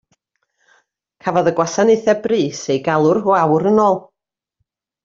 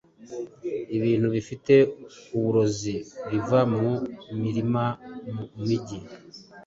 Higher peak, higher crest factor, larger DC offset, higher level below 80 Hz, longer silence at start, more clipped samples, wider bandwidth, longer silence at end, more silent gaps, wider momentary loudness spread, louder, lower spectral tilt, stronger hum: first, -2 dBFS vs -6 dBFS; about the same, 16 dB vs 20 dB; neither; about the same, -60 dBFS vs -58 dBFS; first, 1.25 s vs 0.2 s; neither; about the same, 7.6 kHz vs 7.8 kHz; first, 1.05 s vs 0.05 s; neither; second, 6 LU vs 18 LU; first, -16 LUFS vs -25 LUFS; second, -5.5 dB/octave vs -7 dB/octave; neither